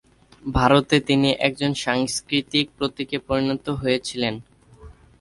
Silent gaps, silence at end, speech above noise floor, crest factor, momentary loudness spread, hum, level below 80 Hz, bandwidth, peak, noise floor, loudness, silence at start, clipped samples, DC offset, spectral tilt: none; 0.3 s; 25 dB; 20 dB; 9 LU; none; -42 dBFS; 11.5 kHz; -2 dBFS; -46 dBFS; -22 LUFS; 0.45 s; under 0.1%; under 0.1%; -4.5 dB/octave